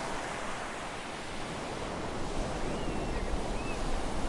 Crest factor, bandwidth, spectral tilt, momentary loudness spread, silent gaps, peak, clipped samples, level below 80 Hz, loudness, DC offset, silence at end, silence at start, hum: 14 dB; 11.5 kHz; -4.5 dB/octave; 3 LU; none; -20 dBFS; under 0.1%; -40 dBFS; -37 LUFS; under 0.1%; 0 s; 0 s; none